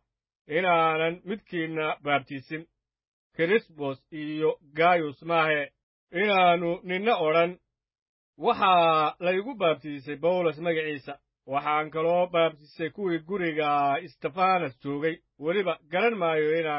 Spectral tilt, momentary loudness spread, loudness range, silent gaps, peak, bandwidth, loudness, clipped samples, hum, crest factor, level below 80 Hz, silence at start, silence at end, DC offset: -9.5 dB/octave; 12 LU; 4 LU; 3.08-3.30 s, 5.83-6.07 s, 8.02-8.33 s; -10 dBFS; 5.8 kHz; -26 LUFS; under 0.1%; none; 18 dB; -72 dBFS; 0.5 s; 0 s; under 0.1%